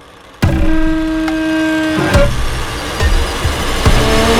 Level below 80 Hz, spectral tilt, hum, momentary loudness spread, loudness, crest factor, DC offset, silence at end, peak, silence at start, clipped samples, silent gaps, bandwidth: -18 dBFS; -5 dB/octave; none; 6 LU; -15 LUFS; 12 dB; under 0.1%; 0 s; 0 dBFS; 0.25 s; under 0.1%; none; 16.5 kHz